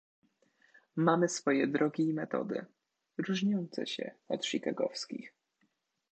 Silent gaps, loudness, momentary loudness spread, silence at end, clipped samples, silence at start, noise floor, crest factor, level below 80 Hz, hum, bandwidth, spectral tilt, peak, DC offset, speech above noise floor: none; -33 LUFS; 11 LU; 0.85 s; under 0.1%; 0.95 s; -77 dBFS; 22 dB; -86 dBFS; none; 9 kHz; -5 dB/octave; -12 dBFS; under 0.1%; 45 dB